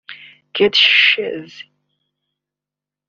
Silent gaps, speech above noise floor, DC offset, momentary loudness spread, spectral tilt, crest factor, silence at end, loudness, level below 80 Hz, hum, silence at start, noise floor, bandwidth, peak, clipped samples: none; 72 dB; under 0.1%; 18 LU; 1 dB/octave; 20 dB; 1.45 s; -12 LUFS; -64 dBFS; 50 Hz at -55 dBFS; 0.1 s; -87 dBFS; 7.4 kHz; 0 dBFS; under 0.1%